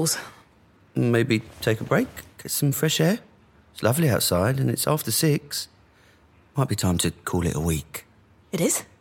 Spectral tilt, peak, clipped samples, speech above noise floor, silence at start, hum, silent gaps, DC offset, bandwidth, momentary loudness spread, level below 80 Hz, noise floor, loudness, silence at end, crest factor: -4.5 dB/octave; -6 dBFS; under 0.1%; 33 dB; 0 s; none; none; under 0.1%; 17 kHz; 11 LU; -48 dBFS; -57 dBFS; -24 LUFS; 0.15 s; 18 dB